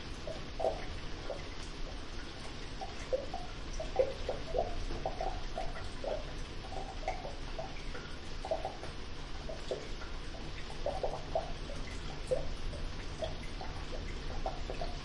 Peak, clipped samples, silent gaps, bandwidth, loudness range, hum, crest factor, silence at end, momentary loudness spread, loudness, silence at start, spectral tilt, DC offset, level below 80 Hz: -18 dBFS; under 0.1%; none; 11 kHz; 4 LU; none; 20 dB; 0 s; 8 LU; -41 LUFS; 0 s; -5 dB/octave; under 0.1%; -42 dBFS